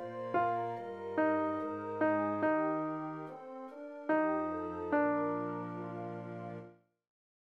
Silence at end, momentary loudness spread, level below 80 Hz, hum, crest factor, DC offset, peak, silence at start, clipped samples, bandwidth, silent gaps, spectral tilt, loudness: 0.8 s; 14 LU; -76 dBFS; none; 16 dB; under 0.1%; -18 dBFS; 0 s; under 0.1%; 5.4 kHz; none; -9 dB/octave; -35 LUFS